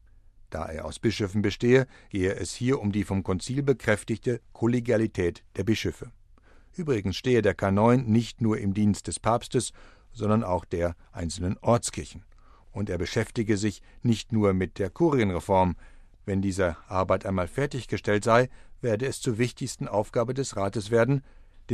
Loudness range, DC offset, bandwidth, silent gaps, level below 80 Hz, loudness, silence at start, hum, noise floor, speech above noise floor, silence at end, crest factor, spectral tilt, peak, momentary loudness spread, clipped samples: 4 LU; under 0.1%; 13 kHz; none; -48 dBFS; -27 LUFS; 0.5 s; none; -54 dBFS; 28 dB; 0 s; 20 dB; -6 dB/octave; -6 dBFS; 10 LU; under 0.1%